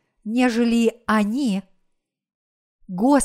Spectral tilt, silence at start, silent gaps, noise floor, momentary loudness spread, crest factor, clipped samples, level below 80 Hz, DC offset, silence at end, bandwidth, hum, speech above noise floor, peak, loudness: -5 dB/octave; 0.25 s; 2.35-2.79 s; -71 dBFS; 8 LU; 16 dB; under 0.1%; -56 dBFS; under 0.1%; 0 s; 14.5 kHz; none; 51 dB; -6 dBFS; -21 LUFS